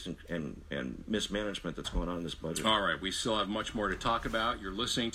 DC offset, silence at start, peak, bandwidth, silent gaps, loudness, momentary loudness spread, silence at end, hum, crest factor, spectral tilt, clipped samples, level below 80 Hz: under 0.1%; 0 s; -14 dBFS; 15.5 kHz; none; -33 LUFS; 10 LU; 0 s; none; 20 dB; -3.5 dB/octave; under 0.1%; -46 dBFS